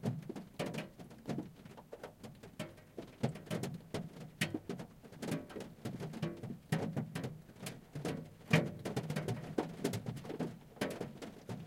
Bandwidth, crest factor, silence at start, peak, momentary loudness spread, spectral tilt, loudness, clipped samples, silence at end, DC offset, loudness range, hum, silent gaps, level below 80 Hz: 16.5 kHz; 28 dB; 0 s; -14 dBFS; 12 LU; -6 dB/octave; -42 LUFS; under 0.1%; 0 s; under 0.1%; 6 LU; none; none; -68 dBFS